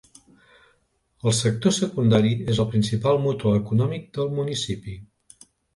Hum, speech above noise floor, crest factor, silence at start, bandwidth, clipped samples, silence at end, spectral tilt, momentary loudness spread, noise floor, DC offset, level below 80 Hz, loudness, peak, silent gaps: none; 45 dB; 18 dB; 1.25 s; 11.5 kHz; under 0.1%; 0.7 s; -6 dB/octave; 8 LU; -67 dBFS; under 0.1%; -50 dBFS; -23 LUFS; -6 dBFS; none